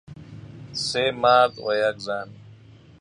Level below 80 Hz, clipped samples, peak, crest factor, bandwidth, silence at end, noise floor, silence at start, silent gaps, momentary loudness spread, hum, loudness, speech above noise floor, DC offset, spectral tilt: -58 dBFS; under 0.1%; -4 dBFS; 20 dB; 11 kHz; 0.45 s; -48 dBFS; 0.1 s; none; 24 LU; none; -22 LUFS; 27 dB; under 0.1%; -3.5 dB/octave